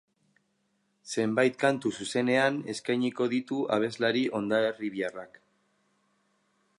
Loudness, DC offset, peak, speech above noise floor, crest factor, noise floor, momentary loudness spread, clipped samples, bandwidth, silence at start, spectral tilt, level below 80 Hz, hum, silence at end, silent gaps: -28 LUFS; under 0.1%; -10 dBFS; 46 dB; 20 dB; -74 dBFS; 8 LU; under 0.1%; 11.5 kHz; 1.05 s; -5 dB/octave; -76 dBFS; none; 1.55 s; none